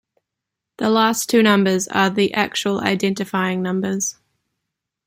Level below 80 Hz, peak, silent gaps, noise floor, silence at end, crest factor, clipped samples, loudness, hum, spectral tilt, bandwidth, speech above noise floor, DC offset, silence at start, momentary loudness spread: -62 dBFS; -2 dBFS; none; -83 dBFS; 0.95 s; 18 dB; under 0.1%; -19 LUFS; none; -4 dB/octave; 16 kHz; 64 dB; under 0.1%; 0.8 s; 7 LU